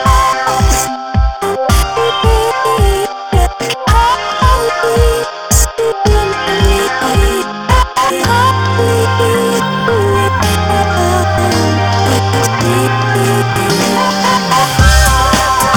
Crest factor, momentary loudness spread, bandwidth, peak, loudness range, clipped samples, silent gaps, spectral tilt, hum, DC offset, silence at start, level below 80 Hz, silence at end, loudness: 10 dB; 4 LU; 19 kHz; 0 dBFS; 2 LU; 0.3%; none; -4.5 dB/octave; none; 0.2%; 0 s; -18 dBFS; 0 s; -12 LUFS